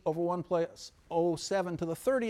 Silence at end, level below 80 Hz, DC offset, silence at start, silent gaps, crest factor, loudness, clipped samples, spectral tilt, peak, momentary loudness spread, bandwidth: 0 s; -64 dBFS; under 0.1%; 0.05 s; none; 14 dB; -33 LUFS; under 0.1%; -5.5 dB/octave; -18 dBFS; 5 LU; 15 kHz